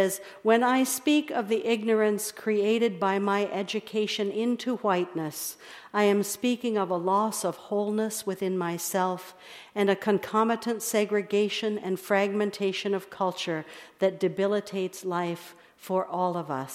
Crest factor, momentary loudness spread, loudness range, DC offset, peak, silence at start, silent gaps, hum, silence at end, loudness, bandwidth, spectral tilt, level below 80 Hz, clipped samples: 18 dB; 8 LU; 3 LU; under 0.1%; -10 dBFS; 0 s; none; none; 0 s; -27 LUFS; 16 kHz; -4.5 dB/octave; -78 dBFS; under 0.1%